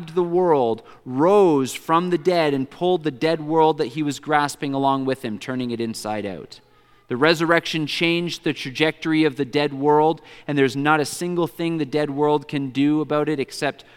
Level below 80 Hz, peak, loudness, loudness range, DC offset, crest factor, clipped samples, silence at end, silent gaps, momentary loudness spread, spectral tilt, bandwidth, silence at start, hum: -64 dBFS; -2 dBFS; -21 LUFS; 3 LU; under 0.1%; 20 dB; under 0.1%; 0.25 s; none; 9 LU; -5.5 dB/octave; 16.5 kHz; 0 s; none